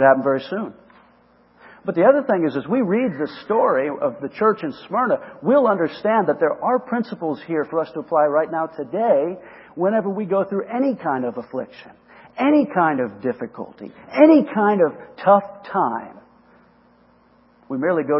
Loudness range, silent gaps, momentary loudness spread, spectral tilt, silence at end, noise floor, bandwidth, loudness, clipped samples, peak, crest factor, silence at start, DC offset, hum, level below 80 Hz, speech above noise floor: 4 LU; none; 14 LU; -11.5 dB/octave; 0 s; -55 dBFS; 5.8 kHz; -20 LUFS; under 0.1%; 0 dBFS; 20 dB; 0 s; under 0.1%; none; -68 dBFS; 36 dB